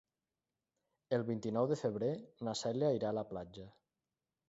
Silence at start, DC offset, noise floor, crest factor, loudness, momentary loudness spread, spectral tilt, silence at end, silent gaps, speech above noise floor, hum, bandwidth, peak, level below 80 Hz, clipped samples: 1.1 s; under 0.1%; under -90 dBFS; 18 dB; -38 LUFS; 12 LU; -6.5 dB/octave; 0.8 s; none; over 53 dB; none; 7.6 kHz; -20 dBFS; -72 dBFS; under 0.1%